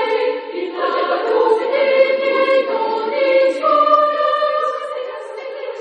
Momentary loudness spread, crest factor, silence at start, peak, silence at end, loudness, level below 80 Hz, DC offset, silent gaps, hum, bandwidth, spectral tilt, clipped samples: 13 LU; 14 dB; 0 s; -2 dBFS; 0 s; -16 LUFS; -72 dBFS; under 0.1%; none; none; 8.8 kHz; -3 dB/octave; under 0.1%